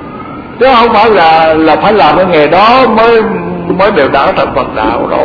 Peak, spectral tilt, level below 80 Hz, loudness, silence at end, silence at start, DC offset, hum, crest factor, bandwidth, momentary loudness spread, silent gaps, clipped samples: 0 dBFS; -7 dB/octave; -34 dBFS; -7 LUFS; 0 s; 0 s; under 0.1%; none; 6 dB; 5.4 kHz; 9 LU; none; 1%